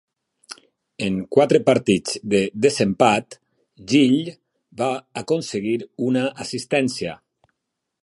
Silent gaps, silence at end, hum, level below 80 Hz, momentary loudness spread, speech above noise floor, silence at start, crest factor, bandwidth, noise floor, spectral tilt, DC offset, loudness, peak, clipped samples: none; 0.85 s; none; -58 dBFS; 14 LU; 60 dB; 0.5 s; 20 dB; 11.5 kHz; -80 dBFS; -5 dB/octave; under 0.1%; -21 LUFS; -2 dBFS; under 0.1%